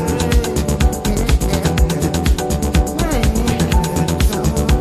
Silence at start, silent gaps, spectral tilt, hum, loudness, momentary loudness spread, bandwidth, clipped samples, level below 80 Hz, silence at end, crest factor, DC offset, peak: 0 s; none; -5.5 dB/octave; none; -17 LUFS; 2 LU; 14.5 kHz; under 0.1%; -18 dBFS; 0 s; 14 dB; under 0.1%; -2 dBFS